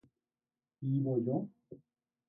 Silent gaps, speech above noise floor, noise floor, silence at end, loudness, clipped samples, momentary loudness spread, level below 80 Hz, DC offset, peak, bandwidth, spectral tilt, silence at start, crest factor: none; over 56 dB; under -90 dBFS; 0.55 s; -35 LUFS; under 0.1%; 10 LU; -78 dBFS; under 0.1%; -22 dBFS; 3.6 kHz; -15 dB/octave; 0.8 s; 16 dB